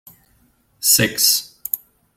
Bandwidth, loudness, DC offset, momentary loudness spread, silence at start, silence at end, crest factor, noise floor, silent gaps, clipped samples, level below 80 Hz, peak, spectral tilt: 16.5 kHz; -16 LUFS; under 0.1%; 12 LU; 0.8 s; 0.4 s; 20 dB; -59 dBFS; none; under 0.1%; -58 dBFS; 0 dBFS; -1 dB/octave